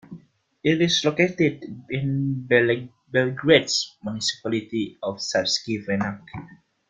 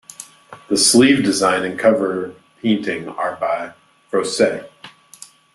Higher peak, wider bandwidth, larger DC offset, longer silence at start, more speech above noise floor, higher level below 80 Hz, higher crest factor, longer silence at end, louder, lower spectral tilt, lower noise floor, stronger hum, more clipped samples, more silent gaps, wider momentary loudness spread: about the same, -2 dBFS vs 0 dBFS; second, 9.6 kHz vs 12.5 kHz; neither; about the same, 0.1 s vs 0.2 s; about the same, 26 dB vs 27 dB; about the same, -60 dBFS vs -60 dBFS; about the same, 22 dB vs 18 dB; second, 0.35 s vs 0.65 s; second, -23 LUFS vs -17 LUFS; first, -4.5 dB/octave vs -3 dB/octave; first, -49 dBFS vs -44 dBFS; neither; neither; neither; second, 11 LU vs 19 LU